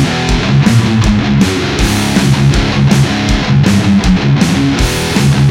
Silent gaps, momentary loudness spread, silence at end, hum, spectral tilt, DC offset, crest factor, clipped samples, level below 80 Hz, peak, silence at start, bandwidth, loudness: none; 3 LU; 0 s; none; -5.5 dB/octave; under 0.1%; 10 dB; 0.1%; -20 dBFS; 0 dBFS; 0 s; 16.5 kHz; -10 LUFS